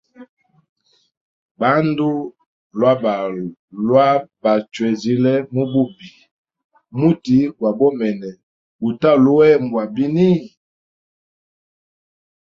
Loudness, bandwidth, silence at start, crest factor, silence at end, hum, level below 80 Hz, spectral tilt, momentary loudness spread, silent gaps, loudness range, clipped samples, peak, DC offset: -17 LUFS; 7.4 kHz; 0.2 s; 18 dB; 1.95 s; none; -60 dBFS; -8 dB/octave; 12 LU; 0.29-0.37 s, 0.69-0.76 s, 1.17-1.55 s, 2.46-2.70 s, 3.59-3.68 s, 6.31-6.44 s, 6.64-6.70 s, 8.43-8.79 s; 4 LU; under 0.1%; -2 dBFS; under 0.1%